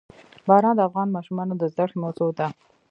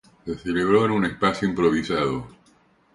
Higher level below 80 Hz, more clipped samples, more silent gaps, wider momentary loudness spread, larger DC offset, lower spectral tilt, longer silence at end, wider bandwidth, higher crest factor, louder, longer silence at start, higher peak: second, -70 dBFS vs -50 dBFS; neither; neither; about the same, 11 LU vs 12 LU; neither; first, -9.5 dB/octave vs -6.5 dB/octave; second, 0.4 s vs 0.65 s; second, 7.6 kHz vs 11.5 kHz; about the same, 20 dB vs 18 dB; about the same, -23 LUFS vs -22 LUFS; first, 0.45 s vs 0.25 s; first, -2 dBFS vs -6 dBFS